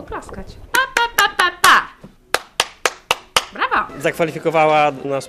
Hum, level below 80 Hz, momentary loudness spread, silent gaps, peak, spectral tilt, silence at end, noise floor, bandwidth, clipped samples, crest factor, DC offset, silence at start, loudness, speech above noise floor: none; -46 dBFS; 13 LU; none; 0 dBFS; -2 dB/octave; 0 s; -41 dBFS; 14 kHz; under 0.1%; 18 dB; under 0.1%; 0 s; -17 LUFS; 22 dB